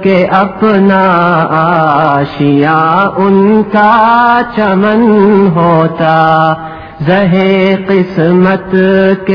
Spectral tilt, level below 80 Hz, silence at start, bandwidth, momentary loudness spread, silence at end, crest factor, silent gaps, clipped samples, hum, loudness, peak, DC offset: -9.5 dB/octave; -42 dBFS; 0 s; 5.4 kHz; 4 LU; 0 s; 8 dB; none; 2%; none; -8 LUFS; 0 dBFS; 0.4%